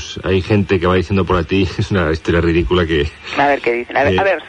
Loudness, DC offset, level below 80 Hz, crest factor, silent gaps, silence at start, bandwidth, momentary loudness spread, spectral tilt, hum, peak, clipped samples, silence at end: -16 LUFS; under 0.1%; -30 dBFS; 12 dB; none; 0 s; 9.2 kHz; 3 LU; -6.5 dB/octave; none; -2 dBFS; under 0.1%; 0 s